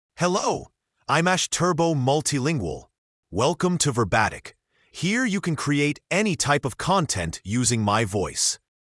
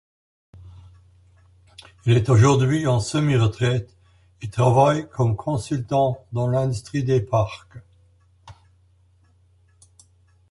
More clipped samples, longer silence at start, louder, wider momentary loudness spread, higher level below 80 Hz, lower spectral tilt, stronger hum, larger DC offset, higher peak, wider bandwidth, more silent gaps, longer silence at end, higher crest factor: neither; second, 0.2 s vs 0.55 s; about the same, -23 LUFS vs -21 LUFS; second, 7 LU vs 10 LU; about the same, -52 dBFS vs -48 dBFS; second, -4 dB/octave vs -7 dB/octave; neither; neither; second, -6 dBFS vs -2 dBFS; about the same, 12 kHz vs 11.5 kHz; first, 2.98-3.23 s vs none; second, 0.35 s vs 2 s; about the same, 18 dB vs 20 dB